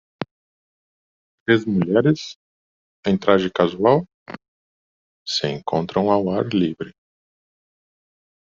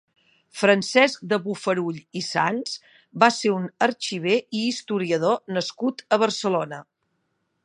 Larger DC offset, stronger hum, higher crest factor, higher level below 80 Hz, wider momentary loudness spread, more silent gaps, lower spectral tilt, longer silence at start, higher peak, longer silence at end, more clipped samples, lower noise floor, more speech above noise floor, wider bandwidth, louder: neither; neither; about the same, 20 dB vs 22 dB; first, -60 dBFS vs -74 dBFS; first, 18 LU vs 11 LU; first, 0.31-1.46 s, 2.36-3.03 s, 4.14-4.26 s, 4.48-5.26 s vs none; about the same, -5 dB/octave vs -4 dB/octave; second, 0.2 s vs 0.55 s; about the same, -2 dBFS vs -2 dBFS; first, 1.65 s vs 0.85 s; neither; first, under -90 dBFS vs -74 dBFS; first, over 71 dB vs 51 dB; second, 7.6 kHz vs 11.5 kHz; first, -20 LUFS vs -23 LUFS